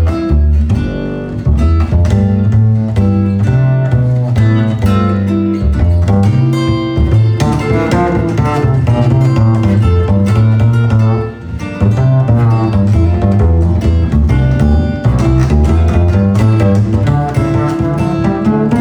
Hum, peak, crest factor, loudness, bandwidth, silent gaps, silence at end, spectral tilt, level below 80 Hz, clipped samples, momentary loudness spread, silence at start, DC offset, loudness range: none; 0 dBFS; 10 dB; -11 LUFS; 9.2 kHz; none; 0 s; -8.5 dB/octave; -18 dBFS; under 0.1%; 3 LU; 0 s; under 0.1%; 1 LU